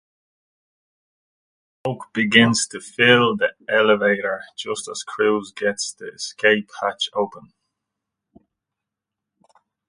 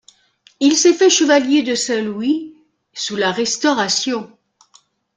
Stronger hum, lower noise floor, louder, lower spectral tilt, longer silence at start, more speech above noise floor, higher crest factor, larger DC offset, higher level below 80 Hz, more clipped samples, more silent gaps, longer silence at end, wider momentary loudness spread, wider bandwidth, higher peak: neither; first, -85 dBFS vs -55 dBFS; second, -20 LUFS vs -16 LUFS; first, -3.5 dB/octave vs -2 dB/octave; first, 1.85 s vs 0.6 s; first, 64 dB vs 39 dB; first, 22 dB vs 16 dB; neither; about the same, -64 dBFS vs -64 dBFS; neither; neither; first, 2.5 s vs 0.9 s; about the same, 15 LU vs 13 LU; about the same, 10.5 kHz vs 9.6 kHz; about the same, 0 dBFS vs 0 dBFS